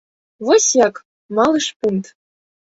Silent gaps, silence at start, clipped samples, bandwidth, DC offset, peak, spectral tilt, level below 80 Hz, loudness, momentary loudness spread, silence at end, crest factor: 1.05-1.29 s, 1.76-1.80 s; 0.4 s; under 0.1%; 8 kHz; under 0.1%; -2 dBFS; -3 dB/octave; -60 dBFS; -17 LUFS; 12 LU; 0.6 s; 16 dB